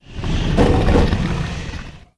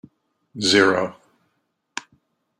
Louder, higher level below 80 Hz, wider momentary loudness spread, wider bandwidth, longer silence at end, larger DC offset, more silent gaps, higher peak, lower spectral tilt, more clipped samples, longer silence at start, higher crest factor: about the same, -18 LUFS vs -19 LUFS; first, -22 dBFS vs -66 dBFS; second, 14 LU vs 19 LU; second, 11 kHz vs 12.5 kHz; second, 0.2 s vs 0.6 s; neither; neither; about the same, 0 dBFS vs -2 dBFS; first, -7 dB/octave vs -3 dB/octave; neither; second, 0.1 s vs 0.55 s; about the same, 18 dB vs 22 dB